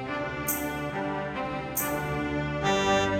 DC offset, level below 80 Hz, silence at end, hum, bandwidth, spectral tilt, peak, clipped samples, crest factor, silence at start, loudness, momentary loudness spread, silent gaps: under 0.1%; -48 dBFS; 0 s; none; 19 kHz; -4 dB/octave; -12 dBFS; under 0.1%; 16 dB; 0 s; -29 LUFS; 7 LU; none